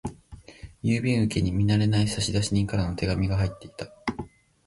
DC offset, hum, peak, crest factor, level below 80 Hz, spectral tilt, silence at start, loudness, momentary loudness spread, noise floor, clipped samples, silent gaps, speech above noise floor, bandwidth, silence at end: under 0.1%; none; -10 dBFS; 16 dB; -42 dBFS; -6 dB/octave; 0.05 s; -26 LUFS; 17 LU; -47 dBFS; under 0.1%; none; 23 dB; 11.5 kHz; 0.4 s